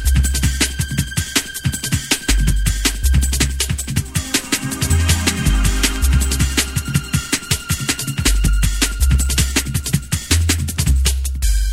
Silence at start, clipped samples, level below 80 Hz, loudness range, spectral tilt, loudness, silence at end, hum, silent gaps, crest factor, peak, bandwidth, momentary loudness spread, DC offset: 0 s; under 0.1%; -20 dBFS; 1 LU; -3.5 dB/octave; -18 LUFS; 0 s; none; none; 16 dB; 0 dBFS; 16.5 kHz; 4 LU; under 0.1%